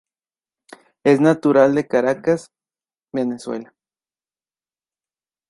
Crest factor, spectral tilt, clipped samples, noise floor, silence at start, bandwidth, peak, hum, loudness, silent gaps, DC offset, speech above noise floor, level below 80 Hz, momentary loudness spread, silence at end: 18 dB; -7 dB/octave; under 0.1%; under -90 dBFS; 1.05 s; 11.5 kHz; -2 dBFS; none; -18 LUFS; none; under 0.1%; over 73 dB; -66 dBFS; 14 LU; 1.85 s